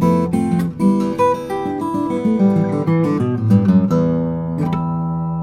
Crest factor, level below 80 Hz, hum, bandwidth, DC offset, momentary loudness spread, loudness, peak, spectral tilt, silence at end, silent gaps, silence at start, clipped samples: 14 dB; -46 dBFS; none; 12.5 kHz; under 0.1%; 7 LU; -17 LUFS; -2 dBFS; -9 dB/octave; 0 s; none; 0 s; under 0.1%